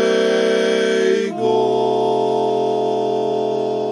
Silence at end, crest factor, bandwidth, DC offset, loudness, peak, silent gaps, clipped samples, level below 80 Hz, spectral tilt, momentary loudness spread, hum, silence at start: 0 s; 12 dB; 10.5 kHz; under 0.1%; -18 LUFS; -6 dBFS; none; under 0.1%; -70 dBFS; -4.5 dB/octave; 4 LU; none; 0 s